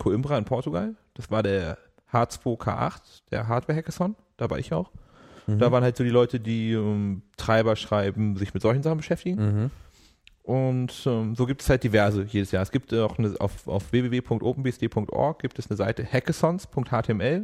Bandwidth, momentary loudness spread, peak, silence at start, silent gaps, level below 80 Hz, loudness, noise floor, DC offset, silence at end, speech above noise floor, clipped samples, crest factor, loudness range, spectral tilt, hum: 14 kHz; 9 LU; -8 dBFS; 0 s; none; -46 dBFS; -26 LUFS; -57 dBFS; under 0.1%; 0 s; 32 dB; under 0.1%; 18 dB; 4 LU; -7 dB/octave; none